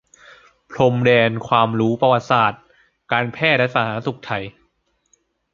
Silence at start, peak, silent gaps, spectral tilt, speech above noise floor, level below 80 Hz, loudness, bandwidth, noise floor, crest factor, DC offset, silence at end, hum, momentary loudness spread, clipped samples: 0.7 s; 0 dBFS; none; -6.5 dB/octave; 49 dB; -56 dBFS; -18 LUFS; 7.4 kHz; -66 dBFS; 20 dB; under 0.1%; 1.05 s; none; 12 LU; under 0.1%